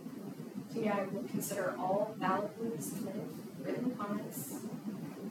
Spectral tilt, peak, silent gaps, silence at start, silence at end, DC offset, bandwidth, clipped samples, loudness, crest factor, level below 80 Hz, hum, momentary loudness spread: -5.5 dB/octave; -22 dBFS; none; 0 s; 0 s; under 0.1%; 18.5 kHz; under 0.1%; -38 LUFS; 16 dB; -86 dBFS; none; 9 LU